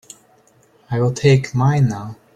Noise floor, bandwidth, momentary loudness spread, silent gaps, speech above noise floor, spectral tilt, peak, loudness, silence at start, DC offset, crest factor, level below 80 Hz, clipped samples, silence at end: -54 dBFS; 9.4 kHz; 9 LU; none; 38 dB; -7 dB/octave; -2 dBFS; -17 LUFS; 0.9 s; under 0.1%; 16 dB; -50 dBFS; under 0.1%; 0.2 s